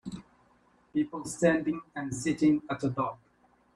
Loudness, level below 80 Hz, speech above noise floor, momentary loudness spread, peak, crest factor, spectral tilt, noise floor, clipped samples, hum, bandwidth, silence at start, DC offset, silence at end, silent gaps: -30 LUFS; -62 dBFS; 36 dB; 10 LU; -10 dBFS; 20 dB; -6 dB/octave; -65 dBFS; under 0.1%; none; 11.5 kHz; 0.05 s; under 0.1%; 0.6 s; none